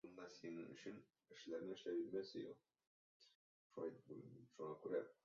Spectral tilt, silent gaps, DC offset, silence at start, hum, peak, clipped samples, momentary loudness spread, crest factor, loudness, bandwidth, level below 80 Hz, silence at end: -5 dB/octave; 2.87-3.20 s, 3.35-3.70 s; under 0.1%; 0.05 s; none; -34 dBFS; under 0.1%; 14 LU; 18 dB; -52 LUFS; 7.2 kHz; under -90 dBFS; 0.1 s